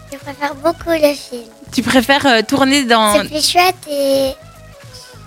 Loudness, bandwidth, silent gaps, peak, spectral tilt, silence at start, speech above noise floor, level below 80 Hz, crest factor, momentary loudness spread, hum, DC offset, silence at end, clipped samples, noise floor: -14 LUFS; 17.5 kHz; none; -2 dBFS; -3 dB/octave; 0 s; 23 dB; -44 dBFS; 14 dB; 14 LU; none; under 0.1%; 0 s; under 0.1%; -37 dBFS